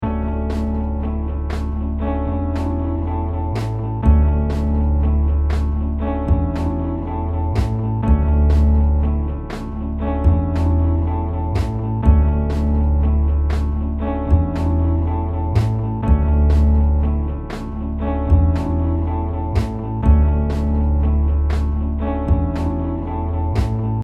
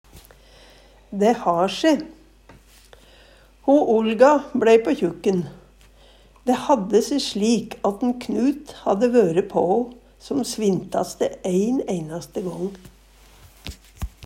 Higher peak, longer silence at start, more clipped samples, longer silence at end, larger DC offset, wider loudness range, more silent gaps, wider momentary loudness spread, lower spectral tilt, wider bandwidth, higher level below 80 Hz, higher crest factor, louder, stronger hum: about the same, 0 dBFS vs -2 dBFS; second, 0 s vs 0.15 s; neither; about the same, 0 s vs 0 s; neither; second, 2 LU vs 5 LU; neither; second, 8 LU vs 15 LU; first, -9.5 dB/octave vs -5.5 dB/octave; second, 5.4 kHz vs 16 kHz; first, -20 dBFS vs -48 dBFS; about the same, 16 dB vs 20 dB; about the same, -19 LUFS vs -21 LUFS; neither